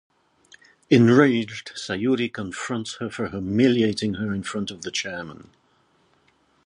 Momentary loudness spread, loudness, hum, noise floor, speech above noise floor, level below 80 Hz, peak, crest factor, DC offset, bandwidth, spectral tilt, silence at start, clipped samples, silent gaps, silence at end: 15 LU; -23 LUFS; none; -63 dBFS; 41 dB; -56 dBFS; -4 dBFS; 20 dB; under 0.1%; 10.5 kHz; -5.5 dB/octave; 0.9 s; under 0.1%; none; 1.3 s